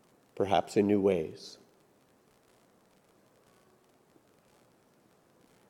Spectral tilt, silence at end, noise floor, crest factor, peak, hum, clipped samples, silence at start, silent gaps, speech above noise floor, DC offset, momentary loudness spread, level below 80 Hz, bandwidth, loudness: -6.5 dB/octave; 4.15 s; -66 dBFS; 22 dB; -12 dBFS; none; under 0.1%; 0.35 s; none; 37 dB; under 0.1%; 22 LU; -76 dBFS; 14 kHz; -29 LUFS